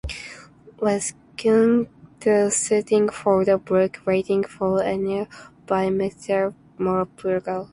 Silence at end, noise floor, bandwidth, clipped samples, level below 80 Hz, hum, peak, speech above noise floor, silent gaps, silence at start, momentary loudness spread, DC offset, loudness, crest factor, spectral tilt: 0.05 s; -45 dBFS; 11.5 kHz; under 0.1%; -50 dBFS; none; -6 dBFS; 24 dB; none; 0.05 s; 9 LU; under 0.1%; -22 LUFS; 16 dB; -5 dB/octave